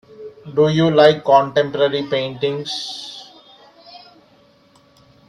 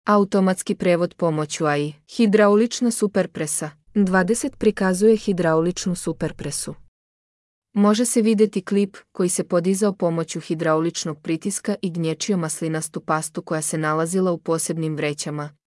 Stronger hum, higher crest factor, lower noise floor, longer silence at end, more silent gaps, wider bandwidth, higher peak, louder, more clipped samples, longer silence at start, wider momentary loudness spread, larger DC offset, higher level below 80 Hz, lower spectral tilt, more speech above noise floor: neither; about the same, 20 dB vs 16 dB; second, -53 dBFS vs under -90 dBFS; first, 1.3 s vs 0.2 s; second, none vs 6.88-7.62 s; about the same, 11 kHz vs 12 kHz; first, 0 dBFS vs -4 dBFS; first, -17 LUFS vs -21 LUFS; neither; first, 0.2 s vs 0.05 s; first, 21 LU vs 9 LU; neither; second, -62 dBFS vs -54 dBFS; about the same, -6 dB/octave vs -5 dB/octave; second, 37 dB vs over 69 dB